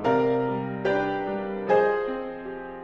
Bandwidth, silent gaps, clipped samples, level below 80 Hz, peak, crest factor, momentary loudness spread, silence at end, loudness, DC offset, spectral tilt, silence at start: 7 kHz; none; under 0.1%; -54 dBFS; -8 dBFS; 18 dB; 12 LU; 0 s; -26 LUFS; under 0.1%; -8 dB/octave; 0 s